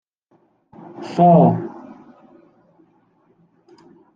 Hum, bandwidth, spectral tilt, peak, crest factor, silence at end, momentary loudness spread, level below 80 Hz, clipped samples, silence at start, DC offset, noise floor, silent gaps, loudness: none; 6.8 kHz; -10 dB/octave; -2 dBFS; 20 dB; 2.45 s; 28 LU; -64 dBFS; under 0.1%; 1 s; under 0.1%; -61 dBFS; none; -15 LUFS